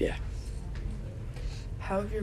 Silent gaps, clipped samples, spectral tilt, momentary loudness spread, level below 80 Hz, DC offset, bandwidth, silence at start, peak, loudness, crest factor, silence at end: none; under 0.1%; -7 dB/octave; 7 LU; -38 dBFS; under 0.1%; 12.5 kHz; 0 s; -16 dBFS; -37 LUFS; 18 dB; 0 s